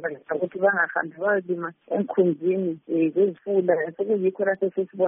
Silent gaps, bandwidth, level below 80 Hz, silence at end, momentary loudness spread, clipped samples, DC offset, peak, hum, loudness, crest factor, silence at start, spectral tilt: none; 3.6 kHz; -76 dBFS; 0 s; 7 LU; under 0.1%; under 0.1%; -8 dBFS; none; -24 LUFS; 16 dB; 0 s; -2 dB/octave